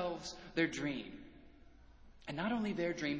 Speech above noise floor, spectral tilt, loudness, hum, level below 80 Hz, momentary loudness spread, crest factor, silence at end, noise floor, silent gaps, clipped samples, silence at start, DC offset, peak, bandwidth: 22 dB; -5 dB/octave; -39 LUFS; none; -64 dBFS; 17 LU; 20 dB; 0 s; -60 dBFS; none; under 0.1%; 0 s; under 0.1%; -20 dBFS; 8 kHz